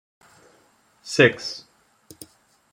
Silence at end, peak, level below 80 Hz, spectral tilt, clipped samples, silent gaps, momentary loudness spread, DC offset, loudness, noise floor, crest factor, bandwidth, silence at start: 1.15 s; -2 dBFS; -68 dBFS; -4.5 dB/octave; under 0.1%; none; 27 LU; under 0.1%; -20 LUFS; -60 dBFS; 24 dB; 16.5 kHz; 1.05 s